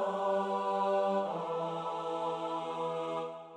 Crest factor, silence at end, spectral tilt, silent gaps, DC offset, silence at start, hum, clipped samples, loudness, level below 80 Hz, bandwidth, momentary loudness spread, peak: 12 dB; 0 s; -6 dB/octave; none; under 0.1%; 0 s; none; under 0.1%; -34 LUFS; -86 dBFS; 10 kHz; 6 LU; -22 dBFS